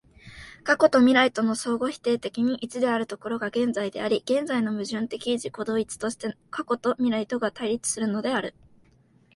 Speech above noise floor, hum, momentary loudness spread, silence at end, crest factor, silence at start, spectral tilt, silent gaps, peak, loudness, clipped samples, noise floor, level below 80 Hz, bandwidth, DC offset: 35 dB; none; 11 LU; 0.85 s; 20 dB; 0.25 s; -4 dB/octave; none; -4 dBFS; -25 LUFS; under 0.1%; -60 dBFS; -62 dBFS; 11.5 kHz; under 0.1%